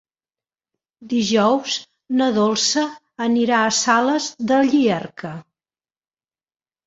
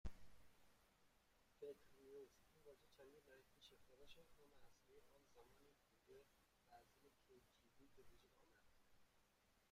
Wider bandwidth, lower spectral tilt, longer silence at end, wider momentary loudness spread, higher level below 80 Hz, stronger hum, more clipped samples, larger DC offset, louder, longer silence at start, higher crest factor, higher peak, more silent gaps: second, 8 kHz vs 15.5 kHz; about the same, -3.5 dB/octave vs -4.5 dB/octave; first, 1.45 s vs 0 s; about the same, 10 LU vs 9 LU; first, -64 dBFS vs -72 dBFS; neither; neither; neither; first, -19 LUFS vs -65 LUFS; first, 1 s vs 0.05 s; second, 18 dB vs 24 dB; first, -2 dBFS vs -40 dBFS; neither